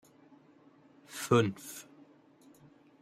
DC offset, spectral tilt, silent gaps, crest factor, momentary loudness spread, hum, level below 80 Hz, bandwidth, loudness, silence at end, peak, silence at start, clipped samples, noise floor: under 0.1%; -5.5 dB/octave; none; 24 dB; 20 LU; none; -74 dBFS; 16 kHz; -31 LUFS; 1.2 s; -14 dBFS; 1.1 s; under 0.1%; -61 dBFS